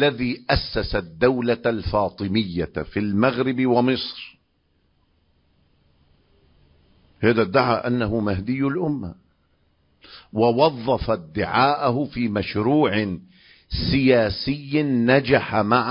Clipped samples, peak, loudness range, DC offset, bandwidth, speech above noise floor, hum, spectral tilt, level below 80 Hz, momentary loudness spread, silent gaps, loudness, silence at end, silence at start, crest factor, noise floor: under 0.1%; -2 dBFS; 5 LU; under 0.1%; 5.4 kHz; 45 dB; none; -10.5 dB/octave; -42 dBFS; 9 LU; none; -21 LUFS; 0 s; 0 s; 20 dB; -66 dBFS